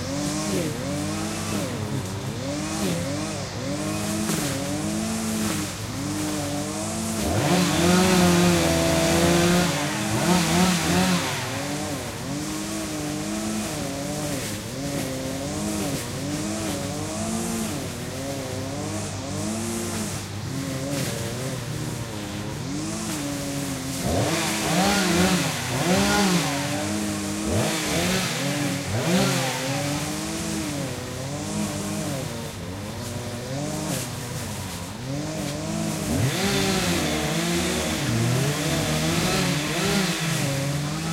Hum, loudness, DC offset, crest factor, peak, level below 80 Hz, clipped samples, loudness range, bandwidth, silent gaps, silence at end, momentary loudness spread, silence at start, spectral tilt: none; -25 LUFS; under 0.1%; 18 dB; -6 dBFS; -44 dBFS; under 0.1%; 9 LU; 16 kHz; none; 0 s; 10 LU; 0 s; -4 dB/octave